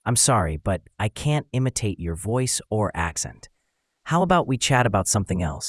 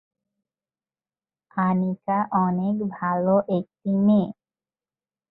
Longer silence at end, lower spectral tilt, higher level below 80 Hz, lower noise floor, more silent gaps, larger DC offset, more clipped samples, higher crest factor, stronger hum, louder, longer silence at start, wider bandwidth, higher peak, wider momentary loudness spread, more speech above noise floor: second, 0 s vs 1 s; second, -4 dB/octave vs -12.5 dB/octave; first, -44 dBFS vs -68 dBFS; second, -74 dBFS vs under -90 dBFS; neither; neither; neither; about the same, 20 dB vs 16 dB; neither; about the same, -23 LUFS vs -23 LUFS; second, 0.05 s vs 1.55 s; first, 12 kHz vs 4.1 kHz; first, -4 dBFS vs -8 dBFS; about the same, 9 LU vs 7 LU; second, 51 dB vs over 68 dB